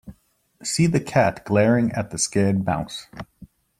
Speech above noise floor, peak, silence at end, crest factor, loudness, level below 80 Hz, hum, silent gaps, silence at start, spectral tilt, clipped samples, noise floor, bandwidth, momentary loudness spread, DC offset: 37 dB; -4 dBFS; 0.35 s; 18 dB; -21 LUFS; -52 dBFS; none; none; 0.05 s; -5 dB/octave; under 0.1%; -58 dBFS; 15 kHz; 16 LU; under 0.1%